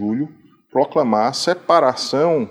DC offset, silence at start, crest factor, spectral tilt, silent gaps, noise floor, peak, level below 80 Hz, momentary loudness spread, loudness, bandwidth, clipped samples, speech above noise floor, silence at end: under 0.1%; 0 s; 16 dB; -4.5 dB/octave; none; -43 dBFS; -2 dBFS; -66 dBFS; 9 LU; -18 LUFS; 13.5 kHz; under 0.1%; 26 dB; 0 s